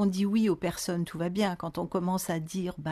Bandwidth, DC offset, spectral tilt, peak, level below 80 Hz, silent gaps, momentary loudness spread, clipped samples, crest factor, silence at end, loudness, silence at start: 13.5 kHz; under 0.1%; -6 dB/octave; -14 dBFS; -58 dBFS; none; 7 LU; under 0.1%; 14 dB; 0 s; -30 LUFS; 0 s